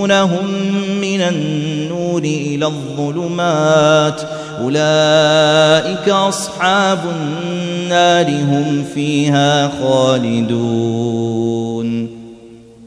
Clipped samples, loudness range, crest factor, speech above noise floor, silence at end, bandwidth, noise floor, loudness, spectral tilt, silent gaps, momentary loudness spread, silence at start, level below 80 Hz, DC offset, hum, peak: under 0.1%; 4 LU; 14 dB; 24 dB; 0 s; 11 kHz; -38 dBFS; -15 LUFS; -5 dB/octave; none; 10 LU; 0 s; -54 dBFS; under 0.1%; none; 0 dBFS